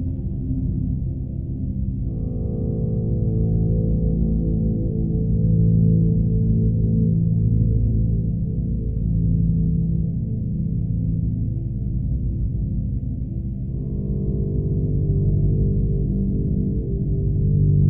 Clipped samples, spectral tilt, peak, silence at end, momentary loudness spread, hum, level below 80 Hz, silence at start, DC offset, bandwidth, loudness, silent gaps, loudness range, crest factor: under 0.1%; -16 dB/octave; -6 dBFS; 0 s; 7 LU; none; -26 dBFS; 0 s; 0.7%; 0.9 kHz; -22 LUFS; none; 6 LU; 14 dB